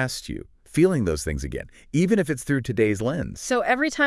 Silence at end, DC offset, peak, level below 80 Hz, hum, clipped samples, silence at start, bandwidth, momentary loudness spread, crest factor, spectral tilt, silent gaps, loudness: 0 s; under 0.1%; -6 dBFS; -42 dBFS; none; under 0.1%; 0 s; 12 kHz; 12 LU; 16 dB; -5.5 dB/octave; none; -24 LUFS